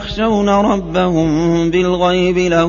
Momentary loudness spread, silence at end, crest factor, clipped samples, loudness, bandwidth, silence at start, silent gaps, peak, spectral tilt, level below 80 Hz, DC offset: 2 LU; 0 s; 12 dB; under 0.1%; -14 LUFS; 7.4 kHz; 0 s; none; -2 dBFS; -6.5 dB/octave; -34 dBFS; under 0.1%